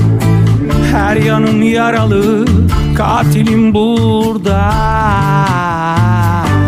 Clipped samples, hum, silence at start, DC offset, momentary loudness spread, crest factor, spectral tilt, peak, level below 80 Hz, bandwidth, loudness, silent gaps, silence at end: under 0.1%; none; 0 s; under 0.1%; 2 LU; 10 dB; -7 dB/octave; 0 dBFS; -24 dBFS; 16 kHz; -11 LUFS; none; 0 s